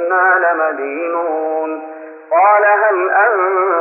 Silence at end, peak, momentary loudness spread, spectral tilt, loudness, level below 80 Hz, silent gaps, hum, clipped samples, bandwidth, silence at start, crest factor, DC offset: 0 s; -2 dBFS; 12 LU; -7 dB/octave; -14 LUFS; -88 dBFS; none; none; under 0.1%; 3 kHz; 0 s; 12 dB; under 0.1%